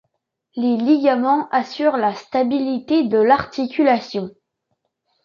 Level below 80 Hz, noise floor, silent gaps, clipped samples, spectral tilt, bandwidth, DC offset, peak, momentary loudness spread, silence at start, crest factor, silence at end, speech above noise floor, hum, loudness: -60 dBFS; -74 dBFS; none; under 0.1%; -6.5 dB/octave; 7 kHz; under 0.1%; -2 dBFS; 8 LU; 0.55 s; 18 dB; 0.95 s; 56 dB; none; -18 LUFS